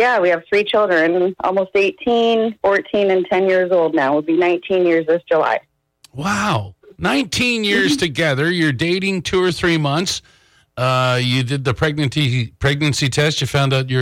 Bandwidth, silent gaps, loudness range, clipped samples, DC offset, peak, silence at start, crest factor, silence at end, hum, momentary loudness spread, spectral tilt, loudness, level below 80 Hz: 16 kHz; none; 2 LU; under 0.1%; under 0.1%; -6 dBFS; 0 s; 10 dB; 0 s; none; 5 LU; -5 dB/octave; -17 LUFS; -46 dBFS